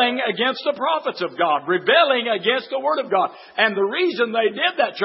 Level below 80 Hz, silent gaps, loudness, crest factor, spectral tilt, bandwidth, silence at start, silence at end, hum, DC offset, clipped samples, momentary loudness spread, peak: -80 dBFS; none; -20 LUFS; 18 dB; -7.5 dB/octave; 5.8 kHz; 0 s; 0 s; none; under 0.1%; under 0.1%; 6 LU; -2 dBFS